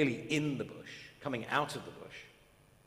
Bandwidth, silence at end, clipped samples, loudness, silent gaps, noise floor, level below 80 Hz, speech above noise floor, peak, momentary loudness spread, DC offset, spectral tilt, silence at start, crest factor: 15.5 kHz; 0.55 s; under 0.1%; -36 LUFS; none; -64 dBFS; -70 dBFS; 28 dB; -16 dBFS; 16 LU; under 0.1%; -5 dB/octave; 0 s; 22 dB